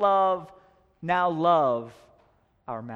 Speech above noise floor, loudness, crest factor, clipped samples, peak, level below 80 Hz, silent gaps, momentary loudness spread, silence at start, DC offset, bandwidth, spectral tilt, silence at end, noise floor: 39 dB; -24 LUFS; 18 dB; under 0.1%; -10 dBFS; -66 dBFS; none; 16 LU; 0 s; under 0.1%; 7.4 kHz; -7.5 dB/octave; 0 s; -64 dBFS